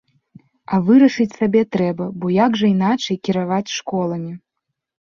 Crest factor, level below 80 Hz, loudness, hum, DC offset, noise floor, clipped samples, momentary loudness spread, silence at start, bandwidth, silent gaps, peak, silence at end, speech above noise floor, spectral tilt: 16 dB; -60 dBFS; -18 LUFS; none; under 0.1%; -78 dBFS; under 0.1%; 11 LU; 0.7 s; 7.2 kHz; none; -2 dBFS; 0.65 s; 61 dB; -6.5 dB/octave